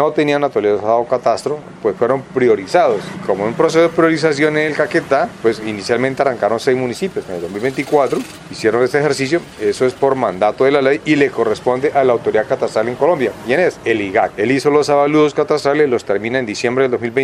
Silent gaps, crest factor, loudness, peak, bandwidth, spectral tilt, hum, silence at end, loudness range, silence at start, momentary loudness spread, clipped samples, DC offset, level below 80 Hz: none; 16 dB; -16 LUFS; 0 dBFS; 12.5 kHz; -5.5 dB/octave; none; 0 s; 3 LU; 0 s; 7 LU; under 0.1%; under 0.1%; -54 dBFS